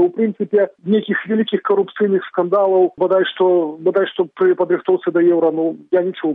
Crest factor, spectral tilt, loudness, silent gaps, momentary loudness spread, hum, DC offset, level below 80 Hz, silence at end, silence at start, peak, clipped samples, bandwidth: 12 dB; -9.5 dB/octave; -17 LUFS; none; 4 LU; none; under 0.1%; -68 dBFS; 0 s; 0 s; -4 dBFS; under 0.1%; 3.9 kHz